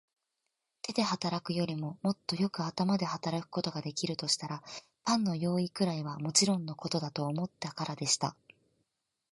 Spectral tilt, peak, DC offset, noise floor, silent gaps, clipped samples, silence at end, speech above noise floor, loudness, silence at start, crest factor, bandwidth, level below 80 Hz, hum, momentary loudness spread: -4 dB/octave; -12 dBFS; under 0.1%; -85 dBFS; none; under 0.1%; 1 s; 52 dB; -33 LUFS; 0.85 s; 22 dB; 11.5 kHz; -74 dBFS; none; 8 LU